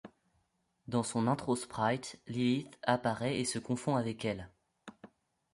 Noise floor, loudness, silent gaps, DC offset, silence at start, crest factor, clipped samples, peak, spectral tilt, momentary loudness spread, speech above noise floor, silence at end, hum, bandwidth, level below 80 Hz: -77 dBFS; -34 LUFS; none; under 0.1%; 0.05 s; 22 dB; under 0.1%; -14 dBFS; -5 dB/octave; 9 LU; 44 dB; 0.45 s; none; 11.5 kHz; -66 dBFS